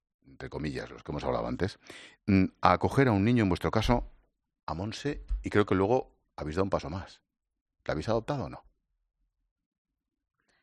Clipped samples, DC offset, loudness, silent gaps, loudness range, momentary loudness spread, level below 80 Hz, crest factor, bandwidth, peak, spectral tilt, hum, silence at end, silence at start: under 0.1%; under 0.1%; -30 LUFS; 4.63-4.67 s, 7.61-7.66 s; 10 LU; 18 LU; -46 dBFS; 26 dB; 11.5 kHz; -6 dBFS; -7 dB/octave; none; 2 s; 0.3 s